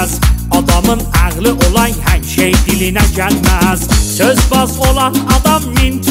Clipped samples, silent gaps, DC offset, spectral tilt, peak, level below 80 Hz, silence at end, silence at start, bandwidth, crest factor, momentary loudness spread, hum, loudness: under 0.1%; none; under 0.1%; -4.5 dB/octave; 0 dBFS; -16 dBFS; 0 s; 0 s; 16.5 kHz; 10 dB; 3 LU; none; -11 LUFS